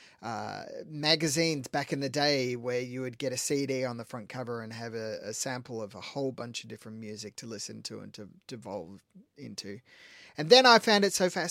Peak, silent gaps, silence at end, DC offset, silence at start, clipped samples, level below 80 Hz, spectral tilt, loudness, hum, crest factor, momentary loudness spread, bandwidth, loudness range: -6 dBFS; none; 0 s; under 0.1%; 0 s; under 0.1%; -76 dBFS; -3.5 dB/octave; -28 LUFS; none; 26 dB; 21 LU; 16.5 kHz; 16 LU